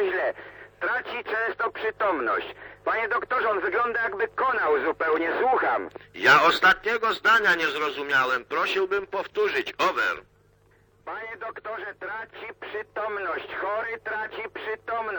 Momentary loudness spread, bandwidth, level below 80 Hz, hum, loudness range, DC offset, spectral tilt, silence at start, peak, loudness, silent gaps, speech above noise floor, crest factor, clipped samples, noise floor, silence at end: 16 LU; 19 kHz; -62 dBFS; 50 Hz at -60 dBFS; 11 LU; under 0.1%; -3 dB/octave; 0 s; -6 dBFS; -25 LUFS; none; 34 dB; 20 dB; under 0.1%; -60 dBFS; 0 s